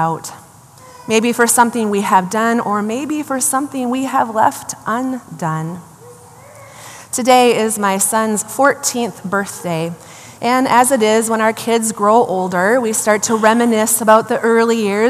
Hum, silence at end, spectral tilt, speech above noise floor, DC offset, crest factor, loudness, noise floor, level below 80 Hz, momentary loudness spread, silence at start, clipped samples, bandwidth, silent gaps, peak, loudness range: none; 0 s; -3.5 dB/octave; 26 dB; under 0.1%; 16 dB; -15 LUFS; -41 dBFS; -64 dBFS; 12 LU; 0 s; under 0.1%; 15 kHz; none; 0 dBFS; 5 LU